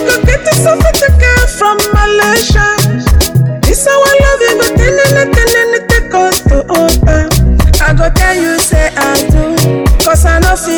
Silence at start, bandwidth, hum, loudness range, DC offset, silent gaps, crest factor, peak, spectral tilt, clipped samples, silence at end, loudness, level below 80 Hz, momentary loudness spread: 0 s; over 20 kHz; none; 1 LU; under 0.1%; none; 8 dB; 0 dBFS; -4.5 dB/octave; 0.9%; 0 s; -8 LUFS; -12 dBFS; 3 LU